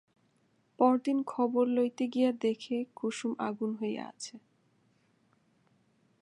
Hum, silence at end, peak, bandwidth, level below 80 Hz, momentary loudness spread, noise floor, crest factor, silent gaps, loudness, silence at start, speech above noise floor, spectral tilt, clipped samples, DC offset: none; 1.85 s; -12 dBFS; 11 kHz; -86 dBFS; 10 LU; -71 dBFS; 20 dB; none; -31 LUFS; 0.8 s; 41 dB; -5 dB/octave; under 0.1%; under 0.1%